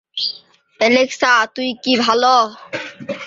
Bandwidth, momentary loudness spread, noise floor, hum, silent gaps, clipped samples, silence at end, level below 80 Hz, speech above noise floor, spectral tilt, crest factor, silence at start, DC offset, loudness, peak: 7.8 kHz; 15 LU; -44 dBFS; none; none; under 0.1%; 0 s; -64 dBFS; 28 dB; -2.5 dB/octave; 16 dB; 0.15 s; under 0.1%; -15 LUFS; -2 dBFS